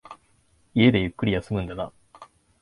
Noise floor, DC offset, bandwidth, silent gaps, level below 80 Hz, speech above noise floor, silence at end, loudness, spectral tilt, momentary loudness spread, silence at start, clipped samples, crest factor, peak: -63 dBFS; under 0.1%; 11 kHz; none; -46 dBFS; 40 dB; 0.35 s; -24 LUFS; -8 dB/octave; 15 LU; 0.1 s; under 0.1%; 20 dB; -4 dBFS